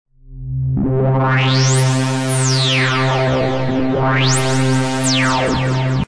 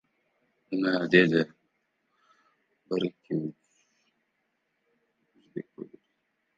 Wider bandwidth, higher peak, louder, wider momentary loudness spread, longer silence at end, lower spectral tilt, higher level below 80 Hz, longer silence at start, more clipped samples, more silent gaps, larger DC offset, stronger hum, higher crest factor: first, 11 kHz vs 7.6 kHz; about the same, -4 dBFS vs -6 dBFS; first, -15 LUFS vs -27 LUFS; second, 4 LU vs 23 LU; second, 0 s vs 0.7 s; second, -4.5 dB/octave vs -7 dB/octave; first, -38 dBFS vs -72 dBFS; second, 0.05 s vs 0.7 s; neither; neither; neither; neither; second, 12 dB vs 26 dB